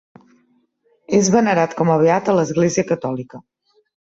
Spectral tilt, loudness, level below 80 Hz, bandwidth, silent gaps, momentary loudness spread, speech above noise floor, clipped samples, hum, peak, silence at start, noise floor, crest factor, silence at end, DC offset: -5.5 dB/octave; -17 LUFS; -58 dBFS; 8 kHz; none; 10 LU; 45 dB; under 0.1%; none; -4 dBFS; 1.1 s; -62 dBFS; 16 dB; 0.75 s; under 0.1%